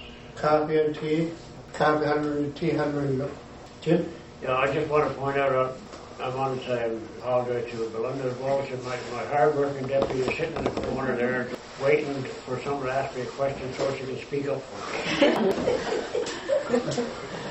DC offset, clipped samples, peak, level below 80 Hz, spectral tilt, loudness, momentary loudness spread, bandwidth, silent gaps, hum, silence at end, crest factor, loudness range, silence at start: under 0.1%; under 0.1%; -8 dBFS; -54 dBFS; -6 dB/octave; -27 LUFS; 10 LU; 8.4 kHz; none; none; 0 s; 20 dB; 3 LU; 0 s